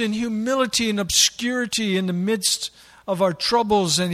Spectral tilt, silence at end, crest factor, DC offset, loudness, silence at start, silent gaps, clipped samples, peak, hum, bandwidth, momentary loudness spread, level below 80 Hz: -3 dB/octave; 0 s; 18 dB; under 0.1%; -20 LUFS; 0 s; none; under 0.1%; -4 dBFS; none; 16 kHz; 8 LU; -52 dBFS